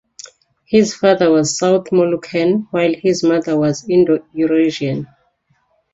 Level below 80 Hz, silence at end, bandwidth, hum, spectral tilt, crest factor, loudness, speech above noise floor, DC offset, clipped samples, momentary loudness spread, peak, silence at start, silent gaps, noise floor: -56 dBFS; 0.9 s; 8 kHz; none; -5.5 dB/octave; 16 dB; -15 LUFS; 47 dB; under 0.1%; under 0.1%; 4 LU; 0 dBFS; 0.25 s; none; -62 dBFS